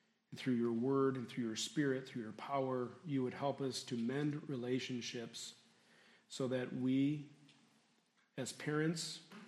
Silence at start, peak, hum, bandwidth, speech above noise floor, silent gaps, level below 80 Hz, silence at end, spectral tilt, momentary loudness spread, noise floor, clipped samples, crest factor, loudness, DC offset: 0.3 s; -24 dBFS; none; 13.5 kHz; 37 dB; none; -86 dBFS; 0 s; -5.5 dB/octave; 11 LU; -76 dBFS; under 0.1%; 18 dB; -40 LUFS; under 0.1%